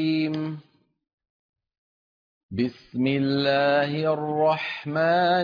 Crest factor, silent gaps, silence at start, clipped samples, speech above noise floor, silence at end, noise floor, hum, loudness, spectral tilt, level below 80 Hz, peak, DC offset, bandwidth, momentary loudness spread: 14 dB; 1.13-1.18 s, 1.30-1.53 s, 1.78-2.49 s; 0 s; under 0.1%; over 67 dB; 0 s; under -90 dBFS; none; -24 LUFS; -8 dB/octave; -66 dBFS; -12 dBFS; under 0.1%; 5.2 kHz; 9 LU